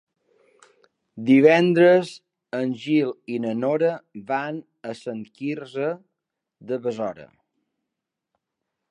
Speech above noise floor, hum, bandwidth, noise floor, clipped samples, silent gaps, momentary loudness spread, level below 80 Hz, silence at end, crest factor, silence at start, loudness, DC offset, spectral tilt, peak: 62 dB; none; 10.5 kHz; -84 dBFS; under 0.1%; none; 18 LU; -76 dBFS; 1.65 s; 20 dB; 1.15 s; -22 LUFS; under 0.1%; -7 dB/octave; -4 dBFS